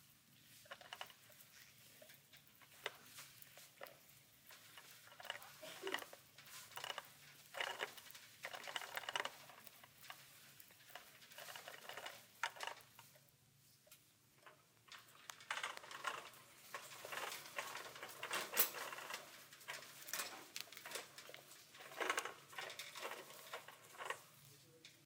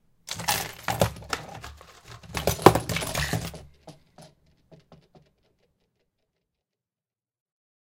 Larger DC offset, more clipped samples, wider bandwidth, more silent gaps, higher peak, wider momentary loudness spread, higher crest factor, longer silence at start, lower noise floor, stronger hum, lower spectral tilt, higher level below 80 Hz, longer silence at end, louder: neither; neither; about the same, 18 kHz vs 17 kHz; neither; second, -18 dBFS vs 0 dBFS; second, 18 LU vs 25 LU; about the same, 34 dB vs 30 dB; second, 0 s vs 0.25 s; second, -71 dBFS vs under -90 dBFS; neither; second, -0.5 dB/octave vs -4 dB/octave; second, under -90 dBFS vs -46 dBFS; second, 0 s vs 3.05 s; second, -48 LUFS vs -26 LUFS